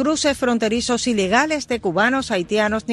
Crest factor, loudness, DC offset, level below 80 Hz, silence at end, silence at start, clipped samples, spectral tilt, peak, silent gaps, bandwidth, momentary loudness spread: 16 dB; -19 LUFS; under 0.1%; -46 dBFS; 0 s; 0 s; under 0.1%; -3.5 dB/octave; -4 dBFS; none; 12.5 kHz; 4 LU